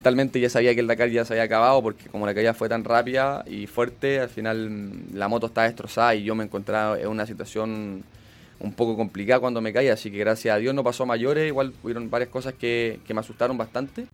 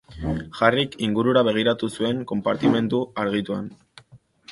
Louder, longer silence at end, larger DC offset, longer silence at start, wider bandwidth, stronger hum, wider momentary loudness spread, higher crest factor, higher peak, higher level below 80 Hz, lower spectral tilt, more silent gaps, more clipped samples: about the same, -24 LUFS vs -23 LUFS; about the same, 0.05 s vs 0 s; neither; about the same, 0 s vs 0.1 s; first, 17 kHz vs 11.5 kHz; neither; about the same, 11 LU vs 10 LU; about the same, 20 dB vs 22 dB; second, -6 dBFS vs -2 dBFS; second, -58 dBFS vs -48 dBFS; about the same, -6 dB/octave vs -6.5 dB/octave; neither; neither